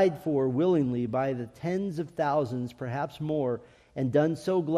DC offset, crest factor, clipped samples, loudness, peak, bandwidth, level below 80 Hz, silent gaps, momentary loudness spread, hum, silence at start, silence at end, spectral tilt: under 0.1%; 16 dB; under 0.1%; -29 LUFS; -12 dBFS; 13.5 kHz; -64 dBFS; none; 9 LU; none; 0 s; 0 s; -8 dB/octave